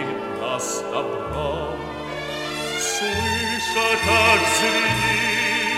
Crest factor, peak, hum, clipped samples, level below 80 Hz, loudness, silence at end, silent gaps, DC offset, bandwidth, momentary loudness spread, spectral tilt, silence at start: 18 dB; -4 dBFS; none; under 0.1%; -46 dBFS; -21 LUFS; 0 s; none; under 0.1%; 16 kHz; 12 LU; -2.5 dB/octave; 0 s